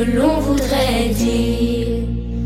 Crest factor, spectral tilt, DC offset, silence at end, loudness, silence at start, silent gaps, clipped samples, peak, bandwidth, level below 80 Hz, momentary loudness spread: 14 dB; -5.5 dB/octave; under 0.1%; 0 s; -18 LUFS; 0 s; none; under 0.1%; -4 dBFS; 16.5 kHz; -26 dBFS; 5 LU